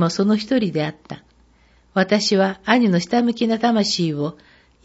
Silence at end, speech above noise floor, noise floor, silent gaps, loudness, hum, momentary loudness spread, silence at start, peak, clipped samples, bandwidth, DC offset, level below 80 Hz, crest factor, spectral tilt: 0.55 s; 36 dB; -55 dBFS; none; -19 LUFS; none; 11 LU; 0 s; 0 dBFS; under 0.1%; 8 kHz; under 0.1%; -58 dBFS; 20 dB; -5 dB/octave